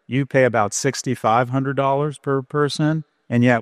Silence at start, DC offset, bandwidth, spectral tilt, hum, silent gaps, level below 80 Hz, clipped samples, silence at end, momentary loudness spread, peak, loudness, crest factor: 0.1 s; under 0.1%; 14 kHz; -5.5 dB/octave; none; none; -60 dBFS; under 0.1%; 0 s; 5 LU; -2 dBFS; -20 LUFS; 16 dB